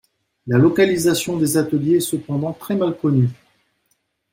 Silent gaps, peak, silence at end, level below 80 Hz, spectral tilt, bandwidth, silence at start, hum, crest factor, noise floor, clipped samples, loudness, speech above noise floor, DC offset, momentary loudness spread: none; -4 dBFS; 1 s; -56 dBFS; -6 dB/octave; 16.5 kHz; 0.45 s; none; 16 dB; -68 dBFS; under 0.1%; -18 LUFS; 51 dB; under 0.1%; 8 LU